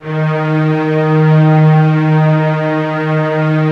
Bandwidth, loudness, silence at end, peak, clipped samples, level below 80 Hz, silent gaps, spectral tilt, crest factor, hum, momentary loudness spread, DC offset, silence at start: 5.2 kHz; -12 LUFS; 0 s; -2 dBFS; under 0.1%; -54 dBFS; none; -9.5 dB/octave; 10 dB; none; 6 LU; under 0.1%; 0 s